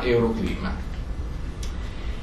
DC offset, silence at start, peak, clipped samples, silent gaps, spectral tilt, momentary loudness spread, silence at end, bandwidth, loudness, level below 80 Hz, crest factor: under 0.1%; 0 s; -10 dBFS; under 0.1%; none; -7 dB/octave; 12 LU; 0 s; 12.5 kHz; -29 LUFS; -30 dBFS; 16 dB